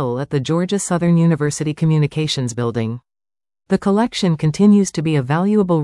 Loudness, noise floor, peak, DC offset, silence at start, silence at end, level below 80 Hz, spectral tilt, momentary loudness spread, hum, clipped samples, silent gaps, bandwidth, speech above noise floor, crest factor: -17 LUFS; under -90 dBFS; -4 dBFS; under 0.1%; 0 s; 0 s; -50 dBFS; -6.5 dB/octave; 7 LU; none; under 0.1%; none; 12 kHz; over 74 dB; 14 dB